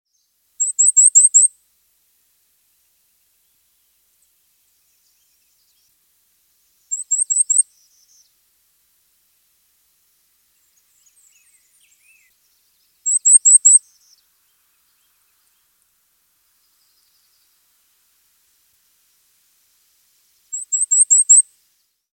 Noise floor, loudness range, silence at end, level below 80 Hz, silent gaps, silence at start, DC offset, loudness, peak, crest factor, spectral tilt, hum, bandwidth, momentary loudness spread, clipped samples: -66 dBFS; 12 LU; 0.75 s; -86 dBFS; none; 0.6 s; under 0.1%; -11 LUFS; 0 dBFS; 22 dB; 6 dB/octave; none; 17 kHz; 18 LU; under 0.1%